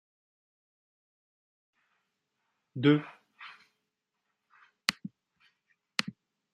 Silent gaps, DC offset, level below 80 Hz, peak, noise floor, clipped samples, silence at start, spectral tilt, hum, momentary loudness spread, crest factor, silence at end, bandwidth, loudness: none; under 0.1%; -78 dBFS; -6 dBFS; -84 dBFS; under 0.1%; 2.75 s; -5 dB/octave; none; 23 LU; 32 dB; 0.45 s; 11.5 kHz; -30 LUFS